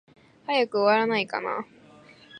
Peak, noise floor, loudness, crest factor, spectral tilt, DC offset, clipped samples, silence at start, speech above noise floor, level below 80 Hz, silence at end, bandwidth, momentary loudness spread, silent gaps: -8 dBFS; -52 dBFS; -25 LUFS; 18 dB; -5.5 dB/octave; under 0.1%; under 0.1%; 0.5 s; 28 dB; -76 dBFS; 0 s; 10 kHz; 16 LU; none